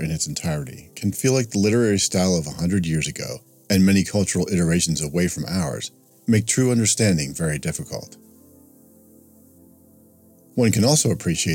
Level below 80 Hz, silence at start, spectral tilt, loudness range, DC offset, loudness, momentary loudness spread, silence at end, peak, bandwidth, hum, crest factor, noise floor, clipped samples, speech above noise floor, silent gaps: -48 dBFS; 0 s; -4.5 dB/octave; 7 LU; under 0.1%; -21 LUFS; 13 LU; 0 s; -6 dBFS; 17.5 kHz; none; 16 dB; -52 dBFS; under 0.1%; 32 dB; none